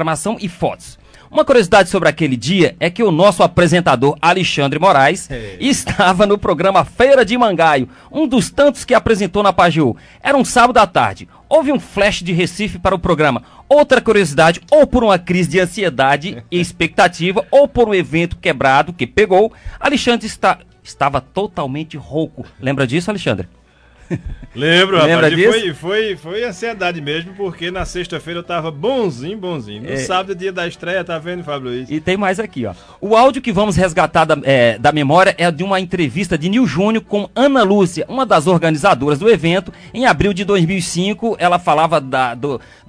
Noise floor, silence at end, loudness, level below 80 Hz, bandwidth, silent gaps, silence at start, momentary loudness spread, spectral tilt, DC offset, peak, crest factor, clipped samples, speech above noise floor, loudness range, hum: -46 dBFS; 0.3 s; -14 LUFS; -38 dBFS; 11 kHz; none; 0 s; 12 LU; -5 dB/octave; under 0.1%; 0 dBFS; 14 dB; under 0.1%; 32 dB; 8 LU; none